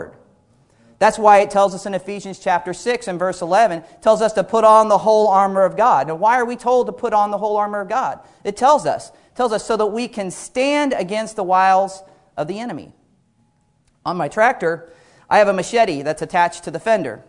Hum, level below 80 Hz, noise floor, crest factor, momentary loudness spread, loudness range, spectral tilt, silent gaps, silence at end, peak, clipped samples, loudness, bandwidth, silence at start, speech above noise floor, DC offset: none; -56 dBFS; -61 dBFS; 18 dB; 13 LU; 6 LU; -4.5 dB/octave; none; 0.1 s; 0 dBFS; under 0.1%; -17 LUFS; 11 kHz; 0 s; 44 dB; under 0.1%